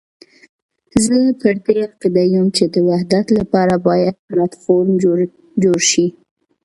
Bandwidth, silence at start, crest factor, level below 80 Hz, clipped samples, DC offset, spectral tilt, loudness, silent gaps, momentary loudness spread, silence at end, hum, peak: 11.5 kHz; 0.95 s; 16 dB; -50 dBFS; under 0.1%; under 0.1%; -5 dB/octave; -15 LUFS; 4.19-4.28 s; 6 LU; 0.55 s; none; 0 dBFS